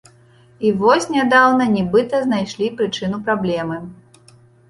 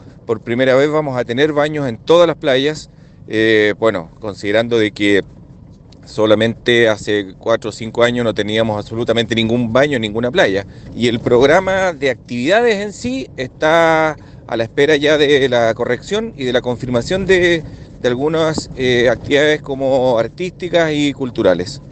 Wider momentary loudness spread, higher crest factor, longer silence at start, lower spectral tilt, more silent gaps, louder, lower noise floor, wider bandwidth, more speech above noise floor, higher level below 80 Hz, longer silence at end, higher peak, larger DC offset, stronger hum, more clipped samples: about the same, 11 LU vs 10 LU; about the same, 16 dB vs 16 dB; first, 0.6 s vs 0 s; about the same, -5.5 dB/octave vs -5.5 dB/octave; neither; about the same, -17 LUFS vs -15 LUFS; first, -50 dBFS vs -40 dBFS; first, 11.5 kHz vs 9 kHz; first, 33 dB vs 25 dB; second, -54 dBFS vs -44 dBFS; first, 0.75 s vs 0 s; about the same, -2 dBFS vs 0 dBFS; neither; neither; neither